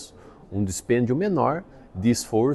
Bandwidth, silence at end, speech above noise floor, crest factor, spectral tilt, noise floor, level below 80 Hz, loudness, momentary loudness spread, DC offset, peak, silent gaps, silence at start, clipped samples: 12.5 kHz; 0 s; 23 dB; 16 dB; -6 dB/octave; -46 dBFS; -52 dBFS; -24 LUFS; 12 LU; under 0.1%; -8 dBFS; none; 0 s; under 0.1%